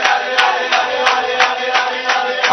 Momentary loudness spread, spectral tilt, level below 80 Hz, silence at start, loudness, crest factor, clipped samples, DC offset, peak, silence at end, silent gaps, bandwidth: 3 LU; 0 dB/octave; -60 dBFS; 0 s; -14 LUFS; 16 dB; under 0.1%; under 0.1%; 0 dBFS; 0 s; none; 11 kHz